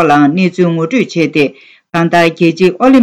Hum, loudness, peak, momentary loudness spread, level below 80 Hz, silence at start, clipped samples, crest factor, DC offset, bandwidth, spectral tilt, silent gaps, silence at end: none; -11 LUFS; 0 dBFS; 6 LU; -50 dBFS; 0 s; under 0.1%; 10 dB; under 0.1%; 12.5 kHz; -6.5 dB/octave; none; 0 s